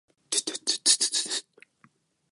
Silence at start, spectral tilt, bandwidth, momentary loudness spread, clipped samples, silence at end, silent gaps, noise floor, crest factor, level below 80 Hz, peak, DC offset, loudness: 0.3 s; 2 dB/octave; 12 kHz; 9 LU; under 0.1%; 0.9 s; none; -64 dBFS; 26 dB; -90 dBFS; -4 dBFS; under 0.1%; -25 LUFS